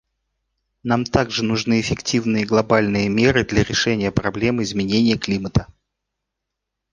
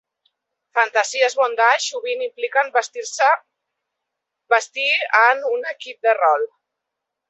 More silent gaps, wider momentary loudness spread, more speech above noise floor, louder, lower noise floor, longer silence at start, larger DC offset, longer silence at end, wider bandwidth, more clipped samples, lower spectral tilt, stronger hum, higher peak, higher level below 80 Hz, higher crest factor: neither; second, 5 LU vs 9 LU; about the same, 62 dB vs 63 dB; about the same, -19 LUFS vs -19 LUFS; about the same, -81 dBFS vs -82 dBFS; about the same, 0.85 s vs 0.75 s; neither; first, 1.3 s vs 0.85 s; first, 9.6 kHz vs 8.4 kHz; neither; first, -5 dB/octave vs 2.5 dB/octave; neither; about the same, -2 dBFS vs -2 dBFS; first, -40 dBFS vs -82 dBFS; about the same, 18 dB vs 20 dB